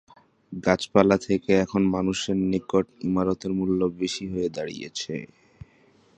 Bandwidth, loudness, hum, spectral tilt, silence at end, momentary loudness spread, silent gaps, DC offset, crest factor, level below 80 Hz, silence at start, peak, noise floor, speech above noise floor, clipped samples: 9.2 kHz; -25 LUFS; none; -6 dB/octave; 0.95 s; 12 LU; none; under 0.1%; 24 dB; -52 dBFS; 0.5 s; -2 dBFS; -59 dBFS; 35 dB; under 0.1%